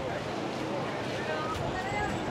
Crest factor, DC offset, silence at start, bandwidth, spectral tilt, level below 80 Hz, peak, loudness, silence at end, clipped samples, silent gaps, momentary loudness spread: 12 dB; under 0.1%; 0 s; 16 kHz; -5 dB/octave; -52 dBFS; -20 dBFS; -33 LUFS; 0 s; under 0.1%; none; 2 LU